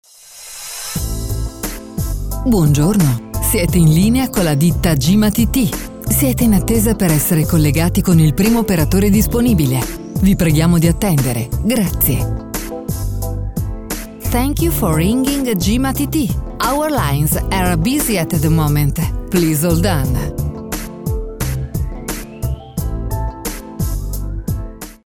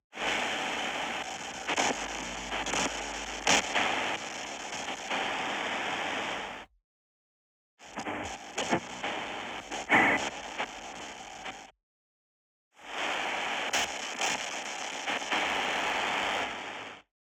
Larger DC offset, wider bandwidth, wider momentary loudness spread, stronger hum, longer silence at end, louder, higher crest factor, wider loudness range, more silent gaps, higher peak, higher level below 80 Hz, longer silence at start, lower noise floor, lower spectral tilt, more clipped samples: neither; about the same, 19 kHz vs over 20 kHz; second, 11 LU vs 15 LU; neither; about the same, 0.1 s vs 0.2 s; first, -16 LUFS vs -31 LUFS; second, 16 dB vs 24 dB; about the same, 8 LU vs 7 LU; second, none vs 6.84-7.77 s, 11.83-12.71 s; first, 0 dBFS vs -10 dBFS; first, -24 dBFS vs -60 dBFS; about the same, 0.25 s vs 0.15 s; second, -37 dBFS vs under -90 dBFS; first, -5.5 dB/octave vs -1.5 dB/octave; neither